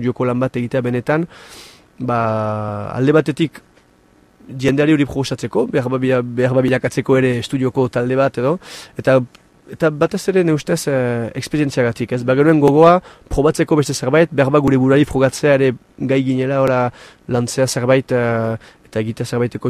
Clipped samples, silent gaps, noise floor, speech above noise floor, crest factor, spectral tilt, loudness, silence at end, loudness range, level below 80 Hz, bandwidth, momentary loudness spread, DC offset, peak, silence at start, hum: under 0.1%; none; -52 dBFS; 36 dB; 16 dB; -6.5 dB/octave; -17 LUFS; 0 s; 5 LU; -44 dBFS; 14.5 kHz; 9 LU; under 0.1%; 0 dBFS; 0 s; none